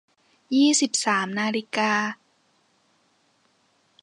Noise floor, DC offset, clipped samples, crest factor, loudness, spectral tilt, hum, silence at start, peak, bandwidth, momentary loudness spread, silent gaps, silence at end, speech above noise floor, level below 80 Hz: -66 dBFS; under 0.1%; under 0.1%; 18 dB; -22 LUFS; -2.5 dB/octave; none; 0.5 s; -8 dBFS; 11.5 kHz; 8 LU; none; 1.9 s; 43 dB; -80 dBFS